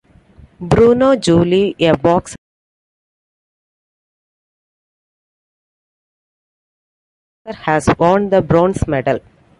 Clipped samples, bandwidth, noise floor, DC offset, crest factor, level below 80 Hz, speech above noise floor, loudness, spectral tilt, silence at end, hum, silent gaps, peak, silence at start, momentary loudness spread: under 0.1%; 11.5 kHz; -45 dBFS; under 0.1%; 16 dB; -38 dBFS; 32 dB; -14 LUFS; -6.5 dB/octave; 0.4 s; none; 2.38-7.45 s; 0 dBFS; 0.6 s; 12 LU